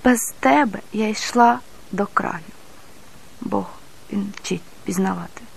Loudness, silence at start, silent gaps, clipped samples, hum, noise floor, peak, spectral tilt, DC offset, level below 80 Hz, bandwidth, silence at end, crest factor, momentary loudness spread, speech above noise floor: -21 LUFS; 0.05 s; none; under 0.1%; none; -47 dBFS; -2 dBFS; -4.5 dB/octave; 1%; -52 dBFS; 14 kHz; 0.1 s; 20 dB; 14 LU; 26 dB